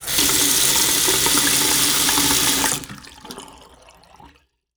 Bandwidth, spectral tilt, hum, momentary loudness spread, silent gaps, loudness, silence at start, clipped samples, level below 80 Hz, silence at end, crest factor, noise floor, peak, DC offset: over 20 kHz; -0.5 dB/octave; none; 22 LU; none; -15 LUFS; 0 s; under 0.1%; -44 dBFS; 0.5 s; 20 dB; -55 dBFS; 0 dBFS; under 0.1%